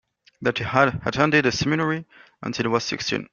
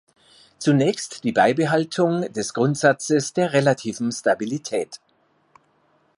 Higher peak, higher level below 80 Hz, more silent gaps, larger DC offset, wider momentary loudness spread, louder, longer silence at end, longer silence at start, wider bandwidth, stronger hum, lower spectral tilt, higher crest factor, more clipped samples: about the same, -2 dBFS vs -4 dBFS; first, -52 dBFS vs -66 dBFS; neither; neither; about the same, 10 LU vs 8 LU; about the same, -22 LUFS vs -21 LUFS; second, 0.1 s vs 1.2 s; second, 0.4 s vs 0.6 s; second, 7.2 kHz vs 11.5 kHz; neither; about the same, -5 dB/octave vs -5 dB/octave; about the same, 22 dB vs 20 dB; neither